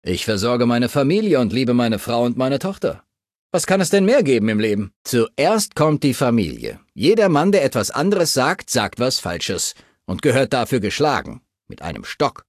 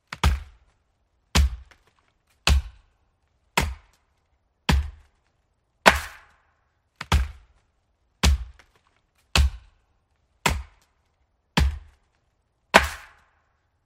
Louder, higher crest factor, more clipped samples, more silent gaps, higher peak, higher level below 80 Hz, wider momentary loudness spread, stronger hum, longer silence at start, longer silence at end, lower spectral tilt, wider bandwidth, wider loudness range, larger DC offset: first, -18 LUFS vs -24 LUFS; second, 16 dB vs 28 dB; neither; first, 3.35-3.50 s, 4.96-5.05 s vs none; about the same, -2 dBFS vs 0 dBFS; second, -46 dBFS vs -30 dBFS; second, 10 LU vs 21 LU; neither; about the same, 0.05 s vs 0.1 s; second, 0.2 s vs 0.85 s; about the same, -5 dB/octave vs -4 dB/octave; about the same, 15 kHz vs 16 kHz; about the same, 3 LU vs 4 LU; neither